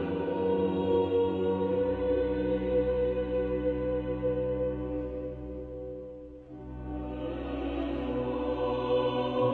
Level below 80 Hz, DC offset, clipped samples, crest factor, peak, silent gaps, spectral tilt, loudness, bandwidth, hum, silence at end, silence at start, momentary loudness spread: -44 dBFS; under 0.1%; under 0.1%; 14 dB; -16 dBFS; none; -9.5 dB/octave; -31 LUFS; 4.4 kHz; none; 0 s; 0 s; 12 LU